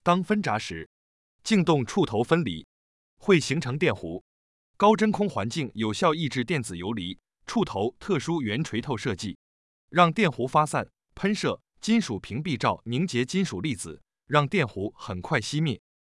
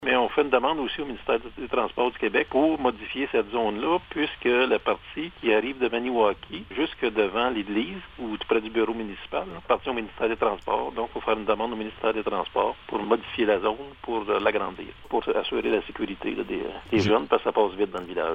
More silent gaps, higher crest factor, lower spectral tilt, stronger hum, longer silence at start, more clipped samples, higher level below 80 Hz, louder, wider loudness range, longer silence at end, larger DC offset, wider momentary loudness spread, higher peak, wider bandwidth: first, 0.86-1.39 s, 2.64-3.17 s, 4.21-4.74 s, 9.35-9.88 s vs none; about the same, 20 dB vs 20 dB; about the same, -5.5 dB/octave vs -6 dB/octave; neither; about the same, 0.05 s vs 0 s; neither; second, -60 dBFS vs -52 dBFS; about the same, -26 LUFS vs -26 LUFS; about the same, 3 LU vs 3 LU; first, 0.4 s vs 0 s; neither; first, 12 LU vs 9 LU; about the same, -6 dBFS vs -6 dBFS; first, 12 kHz vs 7.2 kHz